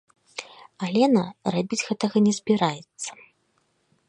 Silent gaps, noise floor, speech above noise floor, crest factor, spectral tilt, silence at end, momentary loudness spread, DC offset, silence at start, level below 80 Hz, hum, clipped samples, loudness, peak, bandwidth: none; -69 dBFS; 46 dB; 18 dB; -5 dB/octave; 0.95 s; 18 LU; under 0.1%; 0.35 s; -70 dBFS; none; under 0.1%; -24 LUFS; -6 dBFS; 11 kHz